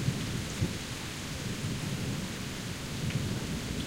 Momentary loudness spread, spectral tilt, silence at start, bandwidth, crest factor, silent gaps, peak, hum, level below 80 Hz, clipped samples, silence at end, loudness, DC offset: 4 LU; -4.5 dB/octave; 0 s; 16 kHz; 18 dB; none; -16 dBFS; none; -48 dBFS; under 0.1%; 0 s; -35 LUFS; under 0.1%